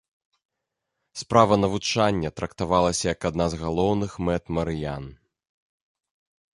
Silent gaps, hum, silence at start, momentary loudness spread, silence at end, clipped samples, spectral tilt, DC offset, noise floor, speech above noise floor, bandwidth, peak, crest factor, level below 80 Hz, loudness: none; none; 1.15 s; 13 LU; 1.4 s; under 0.1%; -5 dB/octave; under 0.1%; -82 dBFS; 59 dB; 11.5 kHz; -2 dBFS; 24 dB; -44 dBFS; -24 LUFS